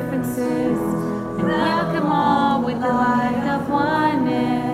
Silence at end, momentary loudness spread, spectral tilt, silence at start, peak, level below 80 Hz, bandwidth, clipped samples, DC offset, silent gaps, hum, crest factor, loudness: 0 s; 5 LU; -6.5 dB/octave; 0 s; -6 dBFS; -48 dBFS; 15.5 kHz; under 0.1%; under 0.1%; none; none; 14 dB; -20 LUFS